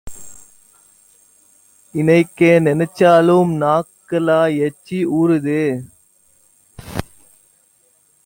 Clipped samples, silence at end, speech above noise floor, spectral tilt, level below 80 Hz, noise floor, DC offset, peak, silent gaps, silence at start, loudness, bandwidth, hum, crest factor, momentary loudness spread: under 0.1%; 1.2 s; 43 dB; -7 dB/octave; -50 dBFS; -57 dBFS; under 0.1%; -2 dBFS; none; 0.05 s; -16 LUFS; 17 kHz; none; 16 dB; 17 LU